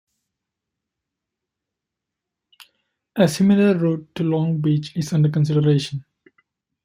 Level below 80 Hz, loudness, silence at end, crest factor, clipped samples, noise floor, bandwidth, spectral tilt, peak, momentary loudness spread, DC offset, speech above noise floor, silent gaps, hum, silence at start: -60 dBFS; -19 LUFS; 0.85 s; 20 dB; under 0.1%; -84 dBFS; 15 kHz; -7 dB/octave; -2 dBFS; 8 LU; under 0.1%; 66 dB; none; none; 3.15 s